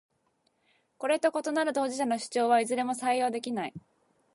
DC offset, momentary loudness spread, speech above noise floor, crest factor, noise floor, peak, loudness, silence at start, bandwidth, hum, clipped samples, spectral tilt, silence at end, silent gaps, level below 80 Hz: under 0.1%; 9 LU; 45 dB; 18 dB; -73 dBFS; -12 dBFS; -29 LUFS; 1 s; 11.5 kHz; none; under 0.1%; -3.5 dB/octave; 0.55 s; none; -80 dBFS